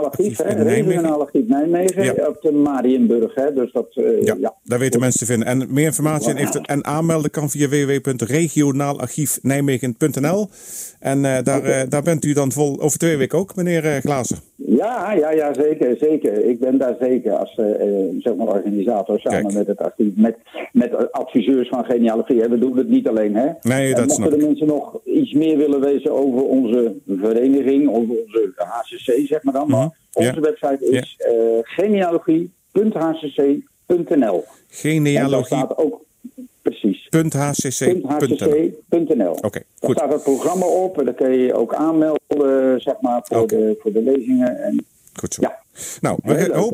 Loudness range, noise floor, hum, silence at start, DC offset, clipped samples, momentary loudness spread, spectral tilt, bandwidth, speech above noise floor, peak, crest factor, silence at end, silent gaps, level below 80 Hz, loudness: 2 LU; -39 dBFS; none; 0 s; under 0.1%; under 0.1%; 6 LU; -6 dB/octave; 16 kHz; 21 dB; -2 dBFS; 16 dB; 0 s; none; -60 dBFS; -18 LUFS